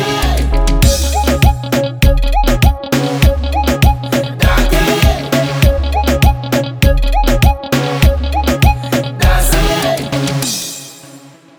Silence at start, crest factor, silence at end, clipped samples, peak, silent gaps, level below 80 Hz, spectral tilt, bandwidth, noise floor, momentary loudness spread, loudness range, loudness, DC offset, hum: 0 s; 12 dB; 0.4 s; under 0.1%; 0 dBFS; none; -14 dBFS; -5 dB/octave; over 20 kHz; -38 dBFS; 4 LU; 1 LU; -13 LUFS; under 0.1%; none